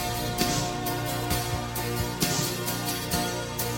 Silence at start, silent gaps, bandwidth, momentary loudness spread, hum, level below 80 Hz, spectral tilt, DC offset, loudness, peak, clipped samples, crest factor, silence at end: 0 s; none; 17 kHz; 4 LU; 60 Hz at -45 dBFS; -42 dBFS; -3.5 dB/octave; under 0.1%; -28 LUFS; -8 dBFS; under 0.1%; 20 dB; 0 s